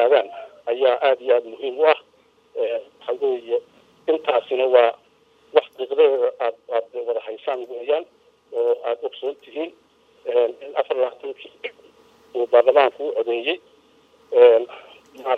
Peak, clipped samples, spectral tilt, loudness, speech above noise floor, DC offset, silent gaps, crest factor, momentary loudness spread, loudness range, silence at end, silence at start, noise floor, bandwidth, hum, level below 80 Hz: -2 dBFS; under 0.1%; -4 dB/octave; -21 LUFS; 38 dB; under 0.1%; none; 20 dB; 16 LU; 7 LU; 0 s; 0 s; -58 dBFS; 4.8 kHz; none; -80 dBFS